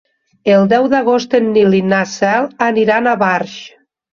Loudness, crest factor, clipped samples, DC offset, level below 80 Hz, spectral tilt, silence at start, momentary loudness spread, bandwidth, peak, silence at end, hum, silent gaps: -13 LUFS; 12 dB; under 0.1%; under 0.1%; -56 dBFS; -6 dB/octave; 0.45 s; 6 LU; 7.4 kHz; -2 dBFS; 0.45 s; none; none